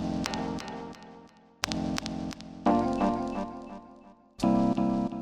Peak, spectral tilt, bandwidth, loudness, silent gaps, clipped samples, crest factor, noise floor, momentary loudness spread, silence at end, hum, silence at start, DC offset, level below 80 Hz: -2 dBFS; -5.5 dB/octave; 15 kHz; -30 LUFS; none; under 0.1%; 28 dB; -54 dBFS; 18 LU; 0 s; none; 0 s; under 0.1%; -50 dBFS